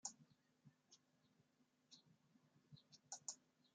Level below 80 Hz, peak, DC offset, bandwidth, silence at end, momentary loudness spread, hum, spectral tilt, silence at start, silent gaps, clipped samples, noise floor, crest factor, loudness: under -90 dBFS; -30 dBFS; under 0.1%; 9 kHz; 0.05 s; 16 LU; none; -1 dB/octave; 0.05 s; none; under 0.1%; -82 dBFS; 32 dB; -56 LUFS